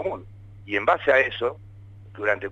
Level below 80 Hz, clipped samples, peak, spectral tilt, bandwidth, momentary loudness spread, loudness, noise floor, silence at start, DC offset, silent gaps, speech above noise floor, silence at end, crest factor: -54 dBFS; under 0.1%; -6 dBFS; -6 dB/octave; 7.8 kHz; 15 LU; -23 LUFS; -44 dBFS; 0 s; under 0.1%; none; 21 dB; 0 s; 18 dB